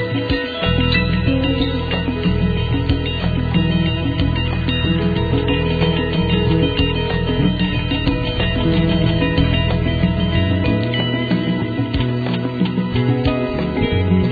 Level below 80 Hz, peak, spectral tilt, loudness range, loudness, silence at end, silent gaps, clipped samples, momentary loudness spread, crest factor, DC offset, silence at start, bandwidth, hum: -26 dBFS; -2 dBFS; -9.5 dB/octave; 1 LU; -18 LUFS; 0 s; none; under 0.1%; 3 LU; 16 dB; under 0.1%; 0 s; 4.9 kHz; none